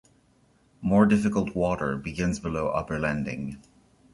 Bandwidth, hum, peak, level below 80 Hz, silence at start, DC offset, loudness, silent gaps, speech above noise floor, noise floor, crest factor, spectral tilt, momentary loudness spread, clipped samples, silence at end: 11.5 kHz; none; -6 dBFS; -48 dBFS; 0.8 s; under 0.1%; -26 LUFS; none; 37 dB; -63 dBFS; 20 dB; -7 dB/octave; 13 LU; under 0.1%; 0.55 s